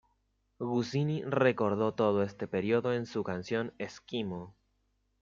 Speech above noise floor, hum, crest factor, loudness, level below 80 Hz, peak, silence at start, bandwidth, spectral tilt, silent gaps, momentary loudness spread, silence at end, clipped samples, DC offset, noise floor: 44 dB; none; 20 dB; -32 LUFS; -70 dBFS; -12 dBFS; 0.6 s; 7.6 kHz; -7 dB/octave; none; 11 LU; 0.7 s; under 0.1%; under 0.1%; -76 dBFS